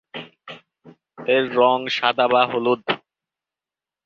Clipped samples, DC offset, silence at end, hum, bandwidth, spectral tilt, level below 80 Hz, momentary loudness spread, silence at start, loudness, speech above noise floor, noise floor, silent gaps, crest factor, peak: under 0.1%; under 0.1%; 1.1 s; none; 7.2 kHz; -5 dB/octave; -70 dBFS; 20 LU; 0.15 s; -19 LUFS; 71 dB; -90 dBFS; none; 20 dB; -2 dBFS